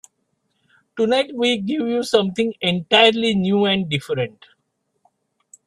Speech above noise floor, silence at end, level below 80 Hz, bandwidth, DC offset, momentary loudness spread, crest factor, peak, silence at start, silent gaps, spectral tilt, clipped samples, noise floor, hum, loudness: 53 dB; 1.4 s; -60 dBFS; 12.5 kHz; under 0.1%; 11 LU; 20 dB; -2 dBFS; 0.95 s; none; -5 dB/octave; under 0.1%; -72 dBFS; none; -19 LUFS